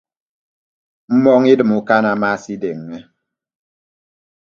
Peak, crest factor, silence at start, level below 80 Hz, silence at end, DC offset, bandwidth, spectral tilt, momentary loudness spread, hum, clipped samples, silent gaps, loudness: 0 dBFS; 18 dB; 1.1 s; -62 dBFS; 1.5 s; under 0.1%; 7.2 kHz; -7 dB/octave; 17 LU; none; under 0.1%; none; -15 LUFS